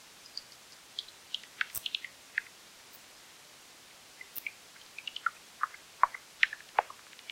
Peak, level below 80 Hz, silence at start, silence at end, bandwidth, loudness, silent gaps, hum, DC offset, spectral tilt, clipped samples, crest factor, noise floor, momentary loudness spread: -8 dBFS; -76 dBFS; 0.25 s; 0 s; 16.5 kHz; -36 LUFS; none; none; under 0.1%; 1 dB/octave; under 0.1%; 30 dB; -55 dBFS; 21 LU